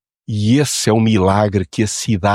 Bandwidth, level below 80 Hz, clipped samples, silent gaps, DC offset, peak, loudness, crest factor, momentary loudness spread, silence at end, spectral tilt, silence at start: 15 kHz; -46 dBFS; under 0.1%; none; under 0.1%; -2 dBFS; -16 LUFS; 14 dB; 6 LU; 0 s; -5.5 dB/octave; 0.3 s